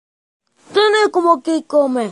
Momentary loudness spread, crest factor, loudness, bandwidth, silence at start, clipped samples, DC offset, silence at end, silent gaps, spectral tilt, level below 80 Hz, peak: 4 LU; 16 dB; -15 LUFS; 11.5 kHz; 0.7 s; under 0.1%; under 0.1%; 0 s; none; -3.5 dB/octave; -72 dBFS; 0 dBFS